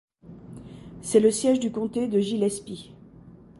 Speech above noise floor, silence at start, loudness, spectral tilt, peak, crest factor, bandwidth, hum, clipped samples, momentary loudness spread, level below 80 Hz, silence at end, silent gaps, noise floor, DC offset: 25 dB; 0.25 s; -24 LUFS; -5 dB/octave; -6 dBFS; 20 dB; 11.5 kHz; none; under 0.1%; 23 LU; -58 dBFS; 0.3 s; none; -49 dBFS; under 0.1%